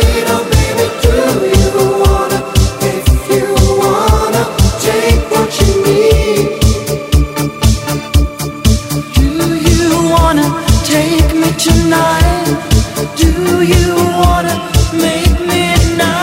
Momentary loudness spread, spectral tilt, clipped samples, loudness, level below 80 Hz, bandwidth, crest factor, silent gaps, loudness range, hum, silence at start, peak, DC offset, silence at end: 4 LU; -5 dB/octave; 0.2%; -11 LUFS; -16 dBFS; 16.5 kHz; 10 dB; none; 2 LU; none; 0 s; 0 dBFS; 0.1%; 0 s